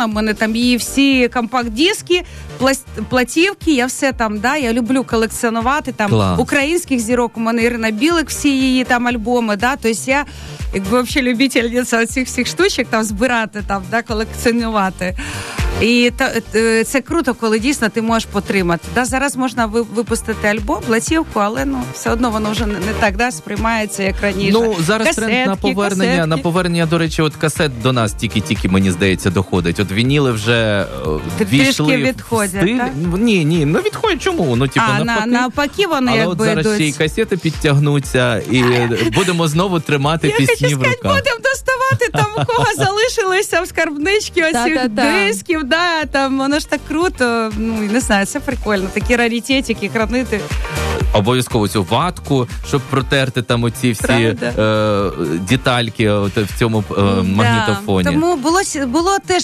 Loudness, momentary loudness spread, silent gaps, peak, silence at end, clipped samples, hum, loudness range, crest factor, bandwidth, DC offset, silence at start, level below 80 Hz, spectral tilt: -16 LUFS; 5 LU; none; -4 dBFS; 0 s; under 0.1%; none; 2 LU; 12 dB; 14 kHz; under 0.1%; 0 s; -32 dBFS; -5 dB/octave